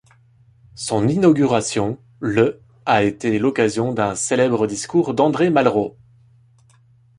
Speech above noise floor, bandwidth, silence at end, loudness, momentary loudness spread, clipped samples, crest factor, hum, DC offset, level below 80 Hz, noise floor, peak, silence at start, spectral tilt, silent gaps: 36 dB; 11.5 kHz; 1.3 s; -19 LUFS; 8 LU; under 0.1%; 18 dB; none; under 0.1%; -54 dBFS; -53 dBFS; -2 dBFS; 0.75 s; -5.5 dB/octave; none